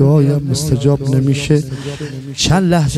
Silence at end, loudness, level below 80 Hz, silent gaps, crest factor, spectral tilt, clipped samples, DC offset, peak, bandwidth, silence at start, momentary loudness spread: 0 s; -15 LUFS; -36 dBFS; none; 14 dB; -6 dB/octave; under 0.1%; under 0.1%; 0 dBFS; 13.5 kHz; 0 s; 12 LU